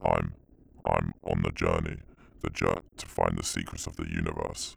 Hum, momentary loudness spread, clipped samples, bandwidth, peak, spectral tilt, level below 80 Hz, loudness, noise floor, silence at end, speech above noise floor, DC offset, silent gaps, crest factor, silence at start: none; 10 LU; under 0.1%; over 20 kHz; -10 dBFS; -5 dB/octave; -42 dBFS; -31 LUFS; -56 dBFS; 0 s; 25 dB; under 0.1%; none; 22 dB; 0 s